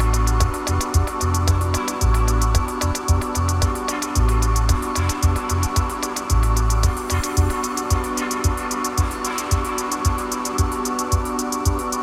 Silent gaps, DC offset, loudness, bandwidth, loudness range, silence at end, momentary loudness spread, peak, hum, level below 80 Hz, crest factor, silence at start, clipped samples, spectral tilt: none; under 0.1%; -21 LUFS; 15.5 kHz; 2 LU; 0 s; 4 LU; -8 dBFS; none; -24 dBFS; 12 dB; 0 s; under 0.1%; -4.5 dB/octave